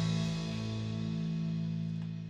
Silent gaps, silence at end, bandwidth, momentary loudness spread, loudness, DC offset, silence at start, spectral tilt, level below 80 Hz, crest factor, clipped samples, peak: none; 0 s; 8.8 kHz; 3 LU; -36 LUFS; under 0.1%; 0 s; -6.5 dB/octave; -58 dBFS; 12 dB; under 0.1%; -22 dBFS